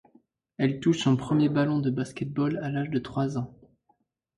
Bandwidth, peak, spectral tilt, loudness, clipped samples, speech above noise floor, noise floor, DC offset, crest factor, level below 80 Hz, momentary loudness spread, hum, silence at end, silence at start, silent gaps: 11 kHz; -12 dBFS; -7 dB/octave; -27 LUFS; under 0.1%; 45 dB; -71 dBFS; under 0.1%; 16 dB; -60 dBFS; 8 LU; none; 0.85 s; 0.6 s; none